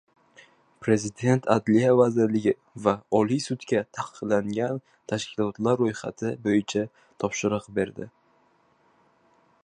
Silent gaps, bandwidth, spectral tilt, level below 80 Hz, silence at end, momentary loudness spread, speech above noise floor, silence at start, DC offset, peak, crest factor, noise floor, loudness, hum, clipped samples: none; 10.5 kHz; -6 dB/octave; -62 dBFS; 1.55 s; 12 LU; 39 dB; 0.8 s; under 0.1%; -4 dBFS; 22 dB; -64 dBFS; -26 LUFS; none; under 0.1%